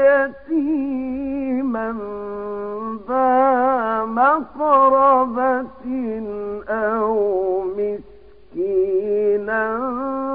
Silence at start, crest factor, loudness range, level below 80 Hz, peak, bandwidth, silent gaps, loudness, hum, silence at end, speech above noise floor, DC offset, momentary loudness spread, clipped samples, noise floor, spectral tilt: 0 s; 16 dB; 6 LU; -52 dBFS; -4 dBFS; 4.8 kHz; none; -20 LUFS; none; 0 s; 29 dB; 0.5%; 12 LU; under 0.1%; -46 dBFS; -10 dB/octave